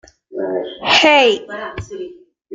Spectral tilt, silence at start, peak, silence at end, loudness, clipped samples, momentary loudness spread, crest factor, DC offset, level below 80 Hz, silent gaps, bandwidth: -3 dB/octave; 0.3 s; 0 dBFS; 0 s; -13 LUFS; under 0.1%; 21 LU; 18 dB; under 0.1%; -50 dBFS; none; 9.4 kHz